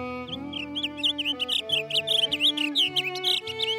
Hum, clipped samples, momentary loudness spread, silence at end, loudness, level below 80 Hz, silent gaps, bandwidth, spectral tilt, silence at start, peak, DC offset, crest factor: none; under 0.1%; 11 LU; 0 s; -24 LUFS; -62 dBFS; none; 17 kHz; -2 dB/octave; 0 s; -14 dBFS; under 0.1%; 14 dB